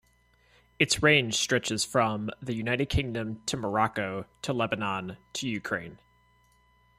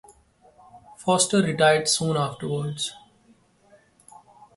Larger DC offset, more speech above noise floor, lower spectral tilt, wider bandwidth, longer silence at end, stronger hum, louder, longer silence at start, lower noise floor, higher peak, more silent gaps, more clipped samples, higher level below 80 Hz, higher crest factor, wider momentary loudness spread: neither; about the same, 36 dB vs 37 dB; about the same, -3.5 dB/octave vs -3.5 dB/octave; first, 16 kHz vs 11.5 kHz; second, 1 s vs 1.6 s; first, 60 Hz at -55 dBFS vs none; second, -28 LUFS vs -23 LUFS; about the same, 0.8 s vs 0.75 s; first, -65 dBFS vs -59 dBFS; about the same, -8 dBFS vs -6 dBFS; neither; neither; first, -50 dBFS vs -62 dBFS; about the same, 22 dB vs 20 dB; about the same, 12 LU vs 11 LU